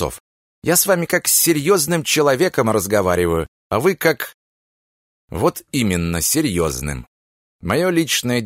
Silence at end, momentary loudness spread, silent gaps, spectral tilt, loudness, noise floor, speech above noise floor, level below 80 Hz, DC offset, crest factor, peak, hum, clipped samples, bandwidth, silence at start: 0 s; 12 LU; 0.20-0.62 s, 3.48-3.70 s, 4.34-5.28 s, 7.08-7.59 s; -3.5 dB/octave; -17 LUFS; under -90 dBFS; over 73 dB; -42 dBFS; under 0.1%; 18 dB; -2 dBFS; none; under 0.1%; 16.5 kHz; 0 s